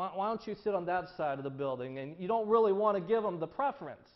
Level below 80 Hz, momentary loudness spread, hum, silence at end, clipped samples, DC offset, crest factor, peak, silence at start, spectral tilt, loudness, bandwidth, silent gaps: -72 dBFS; 10 LU; none; 0.2 s; under 0.1%; under 0.1%; 16 dB; -16 dBFS; 0 s; -5.5 dB/octave; -33 LUFS; 6 kHz; none